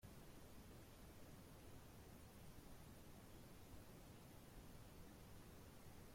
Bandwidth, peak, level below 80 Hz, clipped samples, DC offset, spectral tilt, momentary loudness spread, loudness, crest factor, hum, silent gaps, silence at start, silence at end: 16.5 kHz; -48 dBFS; -68 dBFS; under 0.1%; under 0.1%; -5 dB/octave; 1 LU; -63 LUFS; 14 dB; none; none; 0 s; 0 s